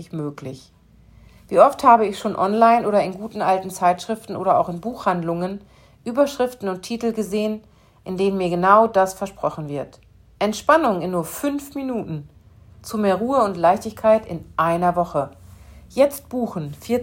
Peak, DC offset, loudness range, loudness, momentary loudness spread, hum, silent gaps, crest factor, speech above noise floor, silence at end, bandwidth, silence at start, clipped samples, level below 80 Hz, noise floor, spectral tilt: 0 dBFS; under 0.1%; 5 LU; -20 LUFS; 16 LU; none; none; 20 dB; 29 dB; 0 s; 16.5 kHz; 0 s; under 0.1%; -54 dBFS; -49 dBFS; -6 dB/octave